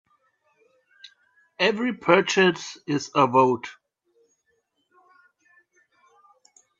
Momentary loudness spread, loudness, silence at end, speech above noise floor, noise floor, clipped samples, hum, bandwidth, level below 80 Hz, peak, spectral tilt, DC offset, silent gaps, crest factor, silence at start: 11 LU; -22 LUFS; 3.1 s; 51 dB; -72 dBFS; under 0.1%; none; 7.6 kHz; -74 dBFS; -2 dBFS; -4.5 dB/octave; under 0.1%; none; 24 dB; 1.6 s